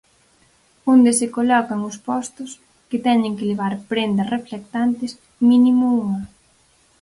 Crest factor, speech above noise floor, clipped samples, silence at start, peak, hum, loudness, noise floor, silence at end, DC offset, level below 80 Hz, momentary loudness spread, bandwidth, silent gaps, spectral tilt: 16 dB; 39 dB; under 0.1%; 0.85 s; -4 dBFS; none; -19 LUFS; -57 dBFS; 0.75 s; under 0.1%; -58 dBFS; 14 LU; 11.5 kHz; none; -5 dB/octave